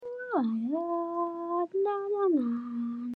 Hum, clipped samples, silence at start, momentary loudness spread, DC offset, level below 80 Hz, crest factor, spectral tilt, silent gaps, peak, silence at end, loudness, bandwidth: none; under 0.1%; 0 s; 6 LU; under 0.1%; under -90 dBFS; 14 dB; -9 dB/octave; none; -16 dBFS; 0 s; -31 LUFS; 4.5 kHz